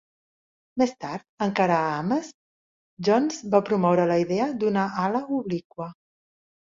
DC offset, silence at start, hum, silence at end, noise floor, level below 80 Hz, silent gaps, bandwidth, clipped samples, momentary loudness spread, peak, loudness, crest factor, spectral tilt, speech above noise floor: under 0.1%; 0.75 s; none; 0.75 s; under -90 dBFS; -66 dBFS; 1.29-1.38 s, 2.34-2.97 s, 5.65-5.70 s; 7.6 kHz; under 0.1%; 14 LU; -6 dBFS; -24 LUFS; 20 dB; -6.5 dB/octave; over 66 dB